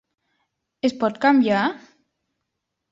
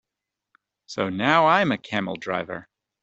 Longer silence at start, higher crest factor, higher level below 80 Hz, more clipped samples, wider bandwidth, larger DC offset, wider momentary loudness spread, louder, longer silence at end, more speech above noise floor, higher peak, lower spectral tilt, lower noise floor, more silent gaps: about the same, 0.85 s vs 0.9 s; about the same, 18 dB vs 22 dB; about the same, -68 dBFS vs -66 dBFS; neither; about the same, 7.6 kHz vs 8.2 kHz; neither; second, 9 LU vs 17 LU; about the same, -20 LUFS vs -22 LUFS; first, 1.15 s vs 0.4 s; about the same, 60 dB vs 63 dB; about the same, -4 dBFS vs -4 dBFS; about the same, -6 dB/octave vs -5.5 dB/octave; second, -80 dBFS vs -86 dBFS; neither